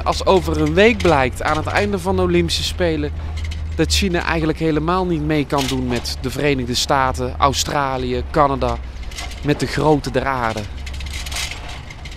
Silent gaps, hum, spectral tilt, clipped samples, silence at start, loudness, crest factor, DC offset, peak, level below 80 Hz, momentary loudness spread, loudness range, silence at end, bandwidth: none; none; -5 dB/octave; under 0.1%; 0 s; -19 LUFS; 18 dB; under 0.1%; 0 dBFS; -28 dBFS; 11 LU; 3 LU; 0 s; 16 kHz